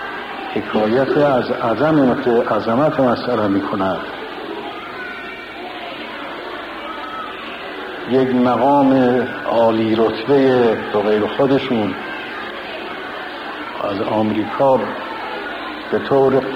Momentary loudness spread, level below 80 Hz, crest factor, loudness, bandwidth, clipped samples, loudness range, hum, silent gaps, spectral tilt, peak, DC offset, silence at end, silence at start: 13 LU; -52 dBFS; 14 dB; -18 LUFS; 11 kHz; under 0.1%; 11 LU; none; none; -7.5 dB/octave; -4 dBFS; under 0.1%; 0 s; 0 s